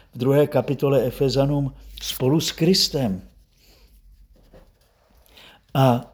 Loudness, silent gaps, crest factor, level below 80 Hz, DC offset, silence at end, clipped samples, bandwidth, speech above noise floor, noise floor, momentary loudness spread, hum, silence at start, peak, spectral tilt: -21 LUFS; none; 20 dB; -46 dBFS; under 0.1%; 0.05 s; under 0.1%; over 20 kHz; 38 dB; -58 dBFS; 10 LU; none; 0.15 s; -4 dBFS; -5.5 dB/octave